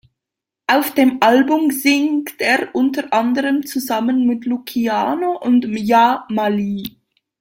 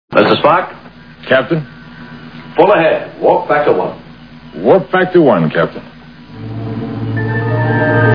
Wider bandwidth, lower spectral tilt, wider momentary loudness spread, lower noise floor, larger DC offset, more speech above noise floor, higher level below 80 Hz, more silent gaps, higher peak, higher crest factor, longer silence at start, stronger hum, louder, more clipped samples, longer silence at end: first, 17 kHz vs 5.4 kHz; second, -4.5 dB/octave vs -9.5 dB/octave; second, 8 LU vs 22 LU; first, -84 dBFS vs -35 dBFS; second, under 0.1% vs 0.4%; first, 68 dB vs 24 dB; second, -62 dBFS vs -46 dBFS; neither; about the same, 0 dBFS vs 0 dBFS; about the same, 16 dB vs 14 dB; first, 0.7 s vs 0.1 s; neither; second, -17 LUFS vs -13 LUFS; second, under 0.1% vs 0.2%; first, 0.5 s vs 0 s